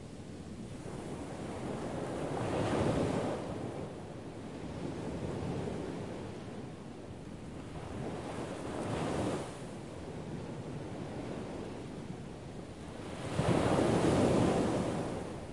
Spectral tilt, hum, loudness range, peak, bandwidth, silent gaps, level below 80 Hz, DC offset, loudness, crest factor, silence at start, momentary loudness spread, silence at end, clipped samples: -6.5 dB/octave; none; 10 LU; -16 dBFS; 11.5 kHz; none; -54 dBFS; 0.1%; -37 LUFS; 20 dB; 0 s; 16 LU; 0 s; under 0.1%